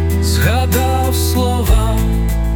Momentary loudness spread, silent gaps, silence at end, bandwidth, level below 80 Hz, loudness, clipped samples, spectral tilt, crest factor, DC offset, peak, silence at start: 3 LU; none; 0 s; 19.5 kHz; -18 dBFS; -15 LUFS; under 0.1%; -5.5 dB/octave; 12 dB; under 0.1%; -2 dBFS; 0 s